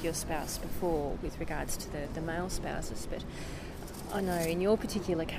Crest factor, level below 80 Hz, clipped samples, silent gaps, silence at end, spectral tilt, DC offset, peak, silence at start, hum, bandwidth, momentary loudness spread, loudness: 16 dB; -44 dBFS; under 0.1%; none; 0 s; -5 dB/octave; under 0.1%; -18 dBFS; 0 s; none; 15.5 kHz; 12 LU; -35 LUFS